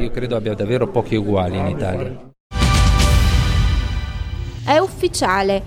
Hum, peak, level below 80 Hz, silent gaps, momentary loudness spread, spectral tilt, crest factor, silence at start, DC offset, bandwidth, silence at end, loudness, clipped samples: none; -4 dBFS; -22 dBFS; 2.40-2.50 s; 12 LU; -5.5 dB/octave; 14 dB; 0 s; under 0.1%; 16 kHz; 0 s; -19 LUFS; under 0.1%